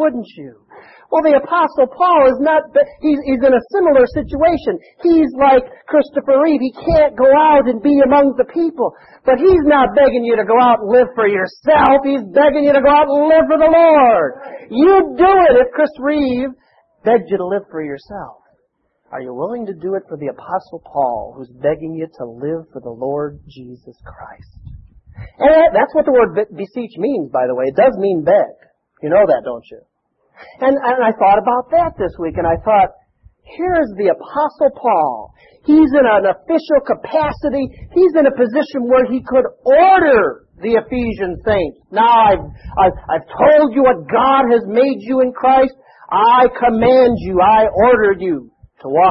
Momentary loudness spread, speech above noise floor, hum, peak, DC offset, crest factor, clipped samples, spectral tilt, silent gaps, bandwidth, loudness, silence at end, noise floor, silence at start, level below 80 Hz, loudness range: 13 LU; 52 dB; none; 0 dBFS; under 0.1%; 14 dB; under 0.1%; -9 dB/octave; none; 5.8 kHz; -13 LUFS; 0 s; -65 dBFS; 0 s; -42 dBFS; 11 LU